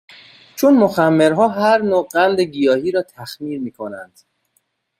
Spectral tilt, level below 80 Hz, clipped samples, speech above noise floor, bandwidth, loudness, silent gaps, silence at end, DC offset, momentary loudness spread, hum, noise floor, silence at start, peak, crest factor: -6 dB/octave; -62 dBFS; under 0.1%; 50 dB; 16 kHz; -16 LUFS; none; 0.95 s; under 0.1%; 17 LU; none; -66 dBFS; 0.55 s; -2 dBFS; 16 dB